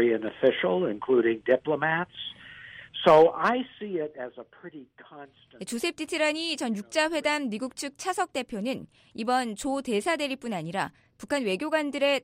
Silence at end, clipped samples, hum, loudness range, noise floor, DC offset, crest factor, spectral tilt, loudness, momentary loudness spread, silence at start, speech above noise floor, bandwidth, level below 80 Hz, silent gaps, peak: 0.05 s; under 0.1%; none; 6 LU; -46 dBFS; under 0.1%; 20 dB; -4 dB/octave; -27 LUFS; 16 LU; 0 s; 19 dB; 16 kHz; -66 dBFS; none; -8 dBFS